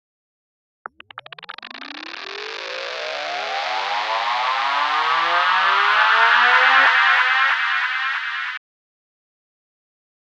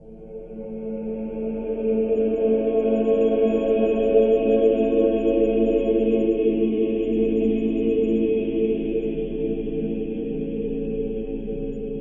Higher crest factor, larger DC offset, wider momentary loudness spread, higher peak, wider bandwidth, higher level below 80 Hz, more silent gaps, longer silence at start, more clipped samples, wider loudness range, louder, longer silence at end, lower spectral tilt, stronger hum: about the same, 18 dB vs 16 dB; neither; first, 21 LU vs 11 LU; first, -2 dBFS vs -6 dBFS; first, 9.6 kHz vs 3.7 kHz; second, -84 dBFS vs -40 dBFS; neither; first, 1.15 s vs 0 s; neither; first, 14 LU vs 6 LU; first, -17 LUFS vs -22 LUFS; first, 1.7 s vs 0 s; second, 0.5 dB/octave vs -9.5 dB/octave; neither